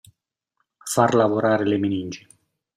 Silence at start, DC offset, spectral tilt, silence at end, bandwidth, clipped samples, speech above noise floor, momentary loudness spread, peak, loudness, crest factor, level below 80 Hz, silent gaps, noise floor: 0.85 s; under 0.1%; -5.5 dB/octave; 0.6 s; 15.5 kHz; under 0.1%; 56 dB; 18 LU; -4 dBFS; -21 LUFS; 18 dB; -64 dBFS; none; -76 dBFS